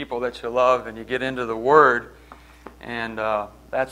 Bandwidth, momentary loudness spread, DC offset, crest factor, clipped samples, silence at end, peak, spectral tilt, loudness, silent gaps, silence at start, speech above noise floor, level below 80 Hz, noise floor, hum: 12 kHz; 14 LU; under 0.1%; 22 dB; under 0.1%; 0 s; 0 dBFS; -5.5 dB/octave; -21 LUFS; none; 0 s; 23 dB; -50 dBFS; -45 dBFS; none